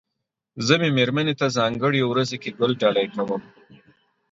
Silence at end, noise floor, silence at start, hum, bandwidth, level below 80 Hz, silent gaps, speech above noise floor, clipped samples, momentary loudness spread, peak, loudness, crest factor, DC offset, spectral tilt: 0.9 s; -81 dBFS; 0.55 s; none; 7.8 kHz; -64 dBFS; none; 59 dB; under 0.1%; 8 LU; -4 dBFS; -22 LUFS; 20 dB; under 0.1%; -5.5 dB/octave